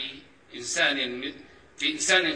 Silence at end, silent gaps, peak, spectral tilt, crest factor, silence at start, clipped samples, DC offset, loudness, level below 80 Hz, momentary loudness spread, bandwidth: 0 s; none; -8 dBFS; -0.5 dB/octave; 20 dB; 0 s; under 0.1%; under 0.1%; -25 LUFS; -66 dBFS; 18 LU; 14 kHz